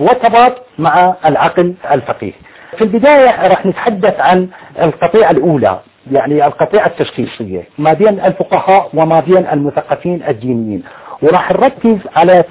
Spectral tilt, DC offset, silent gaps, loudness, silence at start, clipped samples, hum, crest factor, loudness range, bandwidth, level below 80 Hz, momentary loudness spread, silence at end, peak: -10.5 dB/octave; under 0.1%; none; -11 LUFS; 0 s; under 0.1%; none; 10 dB; 2 LU; 4 kHz; -46 dBFS; 12 LU; 0.05 s; 0 dBFS